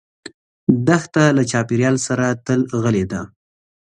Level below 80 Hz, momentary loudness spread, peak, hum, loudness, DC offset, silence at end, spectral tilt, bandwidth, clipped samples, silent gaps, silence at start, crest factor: -50 dBFS; 8 LU; 0 dBFS; none; -18 LUFS; under 0.1%; 0.6 s; -6 dB/octave; 11 kHz; under 0.1%; 0.34-0.67 s; 0.25 s; 18 dB